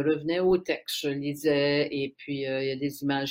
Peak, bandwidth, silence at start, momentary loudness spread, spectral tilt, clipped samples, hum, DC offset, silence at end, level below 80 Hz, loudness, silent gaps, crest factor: -14 dBFS; 16 kHz; 0 s; 7 LU; -5 dB/octave; under 0.1%; none; under 0.1%; 0 s; -64 dBFS; -28 LUFS; none; 14 dB